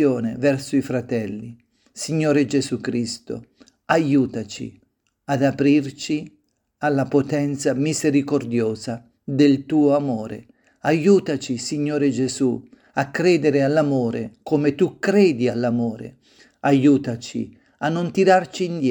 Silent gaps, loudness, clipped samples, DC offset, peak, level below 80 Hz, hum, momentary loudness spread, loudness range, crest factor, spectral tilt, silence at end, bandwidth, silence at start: none; -21 LUFS; under 0.1%; under 0.1%; -2 dBFS; -62 dBFS; none; 14 LU; 3 LU; 18 dB; -6 dB/octave; 0 s; 19 kHz; 0 s